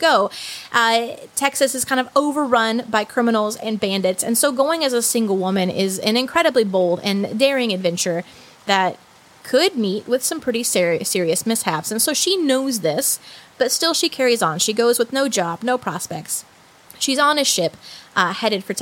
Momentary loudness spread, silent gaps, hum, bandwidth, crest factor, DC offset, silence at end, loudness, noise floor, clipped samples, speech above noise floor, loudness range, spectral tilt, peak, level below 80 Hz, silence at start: 7 LU; none; none; 17 kHz; 18 dB; under 0.1%; 0 s; -19 LUFS; -47 dBFS; under 0.1%; 27 dB; 2 LU; -3 dB/octave; -2 dBFS; -66 dBFS; 0 s